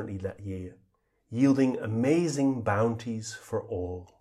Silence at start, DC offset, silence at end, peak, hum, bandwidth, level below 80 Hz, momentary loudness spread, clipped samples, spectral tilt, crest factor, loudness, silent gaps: 0 s; under 0.1%; 0.15 s; -12 dBFS; none; 12 kHz; -62 dBFS; 14 LU; under 0.1%; -6.5 dB/octave; 16 dB; -29 LUFS; none